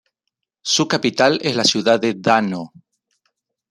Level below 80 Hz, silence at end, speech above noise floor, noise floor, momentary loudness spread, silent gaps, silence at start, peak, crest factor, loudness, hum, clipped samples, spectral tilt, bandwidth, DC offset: -62 dBFS; 1.05 s; 61 dB; -79 dBFS; 12 LU; none; 0.65 s; -2 dBFS; 18 dB; -17 LUFS; none; under 0.1%; -3.5 dB/octave; 13 kHz; under 0.1%